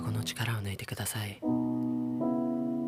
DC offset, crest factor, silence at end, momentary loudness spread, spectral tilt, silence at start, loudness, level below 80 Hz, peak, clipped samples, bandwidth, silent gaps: under 0.1%; 14 dB; 0 s; 4 LU; -5.5 dB/octave; 0 s; -33 LUFS; -64 dBFS; -18 dBFS; under 0.1%; 16 kHz; none